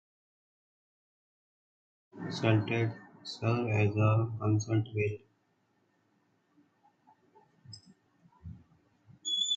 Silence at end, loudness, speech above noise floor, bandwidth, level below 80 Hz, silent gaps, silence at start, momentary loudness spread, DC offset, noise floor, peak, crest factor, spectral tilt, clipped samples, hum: 0 s; -31 LUFS; 44 dB; 8 kHz; -62 dBFS; none; 2.15 s; 23 LU; under 0.1%; -74 dBFS; -12 dBFS; 22 dB; -5.5 dB/octave; under 0.1%; none